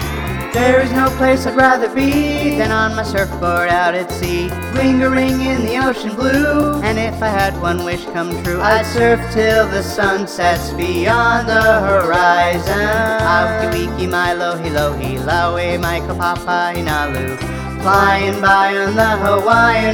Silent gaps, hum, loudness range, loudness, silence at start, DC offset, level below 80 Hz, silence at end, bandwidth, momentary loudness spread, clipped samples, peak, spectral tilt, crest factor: none; none; 3 LU; -15 LUFS; 0 s; under 0.1%; -32 dBFS; 0 s; 19.5 kHz; 7 LU; under 0.1%; 0 dBFS; -5.5 dB/octave; 14 dB